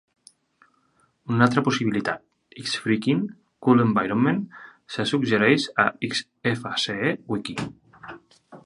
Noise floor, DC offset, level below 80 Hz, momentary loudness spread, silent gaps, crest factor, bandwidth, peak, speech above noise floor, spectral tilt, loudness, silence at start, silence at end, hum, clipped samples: -65 dBFS; under 0.1%; -62 dBFS; 16 LU; none; 22 dB; 11.5 kHz; -2 dBFS; 43 dB; -5.5 dB/octave; -23 LUFS; 1.25 s; 0.05 s; none; under 0.1%